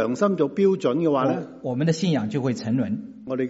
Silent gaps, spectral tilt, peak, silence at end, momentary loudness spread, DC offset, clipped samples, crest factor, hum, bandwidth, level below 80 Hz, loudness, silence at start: none; -7 dB/octave; -8 dBFS; 0 s; 8 LU; under 0.1%; under 0.1%; 16 dB; none; 8 kHz; -64 dBFS; -23 LUFS; 0 s